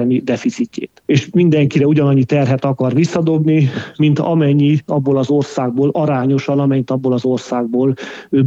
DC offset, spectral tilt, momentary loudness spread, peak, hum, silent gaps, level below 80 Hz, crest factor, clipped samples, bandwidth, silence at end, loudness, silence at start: under 0.1%; -8 dB/octave; 6 LU; -2 dBFS; none; none; -58 dBFS; 14 dB; under 0.1%; 7.8 kHz; 0 s; -15 LUFS; 0 s